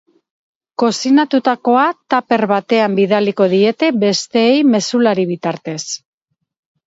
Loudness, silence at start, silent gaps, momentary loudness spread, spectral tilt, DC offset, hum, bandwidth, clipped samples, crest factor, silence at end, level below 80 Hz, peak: -14 LUFS; 0.8 s; none; 10 LU; -5 dB/octave; under 0.1%; none; 8 kHz; under 0.1%; 14 dB; 0.9 s; -66 dBFS; 0 dBFS